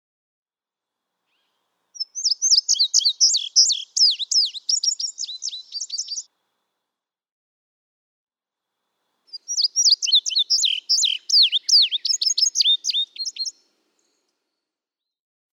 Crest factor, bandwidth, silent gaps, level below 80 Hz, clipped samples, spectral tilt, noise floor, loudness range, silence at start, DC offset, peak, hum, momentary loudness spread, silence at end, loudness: 18 dB; 18 kHz; 7.32-8.27 s; under -90 dBFS; under 0.1%; 9.5 dB/octave; -89 dBFS; 14 LU; 1.95 s; under 0.1%; -6 dBFS; none; 14 LU; 2.05 s; -17 LUFS